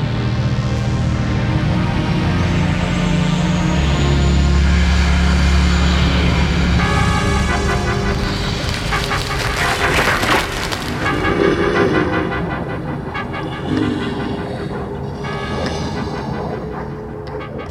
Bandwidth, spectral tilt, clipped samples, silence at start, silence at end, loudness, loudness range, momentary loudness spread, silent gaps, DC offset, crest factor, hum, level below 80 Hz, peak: 14.5 kHz; -5.5 dB/octave; under 0.1%; 0 s; 0 s; -17 LUFS; 7 LU; 9 LU; none; under 0.1%; 16 dB; none; -22 dBFS; -2 dBFS